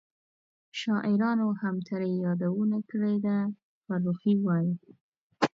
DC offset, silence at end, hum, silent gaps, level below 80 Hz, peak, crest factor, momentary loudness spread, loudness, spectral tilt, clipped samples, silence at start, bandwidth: under 0.1%; 0.1 s; none; 3.63-3.82 s, 5.01-5.12 s, 5.18-5.30 s; -76 dBFS; -10 dBFS; 20 dB; 9 LU; -29 LUFS; -7.5 dB/octave; under 0.1%; 0.75 s; 7.6 kHz